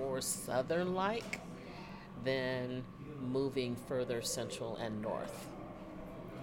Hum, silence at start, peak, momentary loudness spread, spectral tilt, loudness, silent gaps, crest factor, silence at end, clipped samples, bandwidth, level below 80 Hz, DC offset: none; 0 s; -20 dBFS; 13 LU; -4.5 dB/octave; -39 LUFS; none; 18 dB; 0 s; under 0.1%; 17.5 kHz; -62 dBFS; under 0.1%